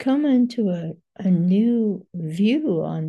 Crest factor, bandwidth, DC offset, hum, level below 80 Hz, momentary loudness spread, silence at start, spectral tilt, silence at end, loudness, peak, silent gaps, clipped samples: 12 dB; 9.2 kHz; under 0.1%; none; -70 dBFS; 11 LU; 0 s; -9 dB/octave; 0 s; -21 LUFS; -8 dBFS; none; under 0.1%